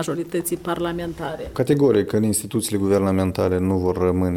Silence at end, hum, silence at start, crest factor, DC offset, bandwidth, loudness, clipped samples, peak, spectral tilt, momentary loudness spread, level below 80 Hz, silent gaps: 0 s; none; 0 s; 16 dB; under 0.1%; 17.5 kHz; -21 LUFS; under 0.1%; -6 dBFS; -6 dB/octave; 9 LU; -46 dBFS; none